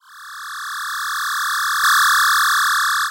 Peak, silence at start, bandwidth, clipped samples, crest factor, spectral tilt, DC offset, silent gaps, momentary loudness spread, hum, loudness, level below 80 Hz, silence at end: -10 dBFS; 0.1 s; 16.5 kHz; under 0.1%; 10 dB; 6 dB/octave; under 0.1%; none; 16 LU; none; -16 LUFS; -62 dBFS; 0 s